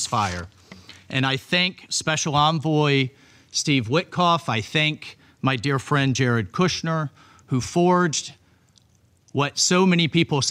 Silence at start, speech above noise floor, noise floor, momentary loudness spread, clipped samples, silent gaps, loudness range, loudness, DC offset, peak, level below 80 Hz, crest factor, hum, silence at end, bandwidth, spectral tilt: 0 s; 38 dB; -60 dBFS; 9 LU; under 0.1%; none; 2 LU; -22 LUFS; under 0.1%; -6 dBFS; -56 dBFS; 16 dB; none; 0 s; 13.5 kHz; -4 dB/octave